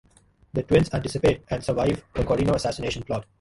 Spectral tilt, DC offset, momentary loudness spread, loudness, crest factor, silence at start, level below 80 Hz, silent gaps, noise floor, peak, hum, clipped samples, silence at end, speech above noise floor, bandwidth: -6.5 dB/octave; under 0.1%; 9 LU; -25 LUFS; 20 dB; 0.55 s; -40 dBFS; none; -58 dBFS; -6 dBFS; none; under 0.1%; 0.2 s; 34 dB; 11.5 kHz